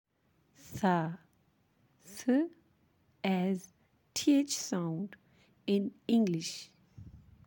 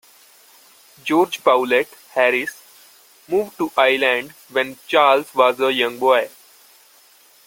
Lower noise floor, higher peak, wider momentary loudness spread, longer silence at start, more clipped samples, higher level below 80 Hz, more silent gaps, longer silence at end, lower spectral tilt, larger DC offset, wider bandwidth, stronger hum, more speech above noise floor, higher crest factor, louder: first, -72 dBFS vs -51 dBFS; second, -16 dBFS vs 0 dBFS; first, 16 LU vs 8 LU; second, 0.65 s vs 1.05 s; neither; about the same, -72 dBFS vs -68 dBFS; neither; second, 0.3 s vs 1.2 s; first, -5 dB/octave vs -3.5 dB/octave; neither; about the same, 17 kHz vs 17 kHz; neither; first, 41 dB vs 33 dB; about the same, 18 dB vs 20 dB; second, -33 LUFS vs -18 LUFS